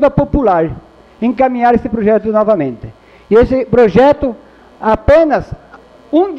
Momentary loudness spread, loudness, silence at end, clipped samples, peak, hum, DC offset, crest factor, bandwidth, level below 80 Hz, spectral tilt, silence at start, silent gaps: 12 LU; -12 LUFS; 0 s; under 0.1%; 0 dBFS; none; under 0.1%; 12 dB; 7.2 kHz; -30 dBFS; -8.5 dB/octave; 0 s; none